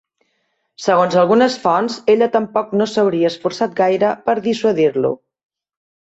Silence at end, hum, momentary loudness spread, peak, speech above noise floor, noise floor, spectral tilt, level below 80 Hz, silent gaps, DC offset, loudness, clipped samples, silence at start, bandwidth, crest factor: 1 s; none; 7 LU; -2 dBFS; 53 dB; -68 dBFS; -5.5 dB/octave; -62 dBFS; none; under 0.1%; -16 LUFS; under 0.1%; 0.8 s; 8 kHz; 14 dB